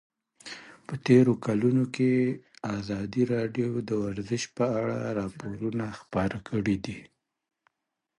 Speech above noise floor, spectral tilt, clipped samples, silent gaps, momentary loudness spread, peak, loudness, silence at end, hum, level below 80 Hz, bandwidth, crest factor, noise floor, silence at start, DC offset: 57 dB; -7 dB/octave; under 0.1%; none; 16 LU; -8 dBFS; -28 LUFS; 1.15 s; none; -58 dBFS; 11 kHz; 22 dB; -84 dBFS; 0.45 s; under 0.1%